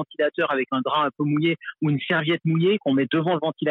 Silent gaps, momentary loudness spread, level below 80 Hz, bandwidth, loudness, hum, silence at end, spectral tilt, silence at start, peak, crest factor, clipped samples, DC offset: none; 4 LU; -72 dBFS; 4.1 kHz; -23 LUFS; none; 0 s; -9 dB/octave; 0 s; -12 dBFS; 12 dB; under 0.1%; under 0.1%